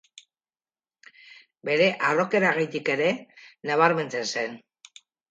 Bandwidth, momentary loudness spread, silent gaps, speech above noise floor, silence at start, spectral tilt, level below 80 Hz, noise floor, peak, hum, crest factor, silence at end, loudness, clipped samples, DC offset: 9.2 kHz; 13 LU; none; over 66 dB; 1.65 s; -4.5 dB/octave; -78 dBFS; under -90 dBFS; -6 dBFS; none; 22 dB; 0.7 s; -24 LUFS; under 0.1%; under 0.1%